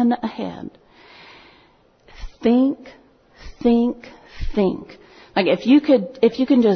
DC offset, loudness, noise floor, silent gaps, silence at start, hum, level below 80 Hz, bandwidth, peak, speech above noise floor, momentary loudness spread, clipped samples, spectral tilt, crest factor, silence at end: under 0.1%; -19 LUFS; -55 dBFS; none; 0 s; none; -42 dBFS; 6.4 kHz; -4 dBFS; 37 dB; 20 LU; under 0.1%; -7.5 dB/octave; 16 dB; 0 s